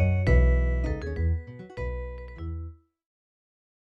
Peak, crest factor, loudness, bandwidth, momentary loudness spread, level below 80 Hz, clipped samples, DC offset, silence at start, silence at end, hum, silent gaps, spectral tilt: -10 dBFS; 18 dB; -27 LUFS; 5.8 kHz; 17 LU; -30 dBFS; under 0.1%; under 0.1%; 0 s; 1.2 s; none; none; -9 dB/octave